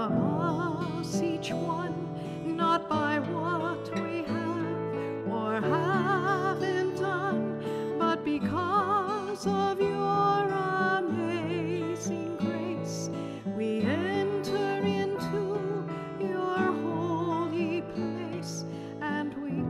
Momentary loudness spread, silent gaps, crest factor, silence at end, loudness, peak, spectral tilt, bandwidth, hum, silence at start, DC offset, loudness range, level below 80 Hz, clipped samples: 7 LU; none; 16 dB; 0 s; -30 LUFS; -14 dBFS; -6 dB/octave; 13.5 kHz; none; 0 s; under 0.1%; 3 LU; -66 dBFS; under 0.1%